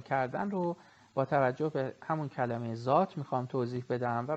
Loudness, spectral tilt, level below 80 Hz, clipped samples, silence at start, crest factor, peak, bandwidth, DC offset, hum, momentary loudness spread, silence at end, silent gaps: -33 LUFS; -8.5 dB/octave; -72 dBFS; under 0.1%; 0 s; 20 dB; -12 dBFS; 8.2 kHz; under 0.1%; none; 7 LU; 0 s; none